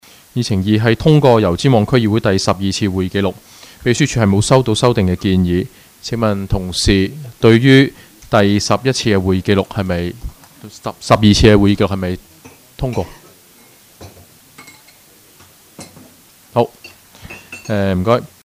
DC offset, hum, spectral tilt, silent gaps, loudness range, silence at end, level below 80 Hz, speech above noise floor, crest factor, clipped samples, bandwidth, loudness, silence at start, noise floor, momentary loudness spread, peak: under 0.1%; none; -6 dB/octave; none; 13 LU; 0.2 s; -34 dBFS; 33 dB; 16 dB; under 0.1%; 16 kHz; -14 LUFS; 0.35 s; -46 dBFS; 16 LU; 0 dBFS